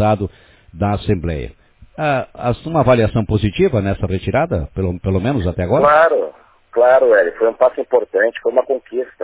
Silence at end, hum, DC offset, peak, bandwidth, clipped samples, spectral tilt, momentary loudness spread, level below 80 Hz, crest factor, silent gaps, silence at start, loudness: 0 s; none; under 0.1%; -2 dBFS; 4 kHz; under 0.1%; -11 dB/octave; 11 LU; -34 dBFS; 14 dB; none; 0 s; -16 LUFS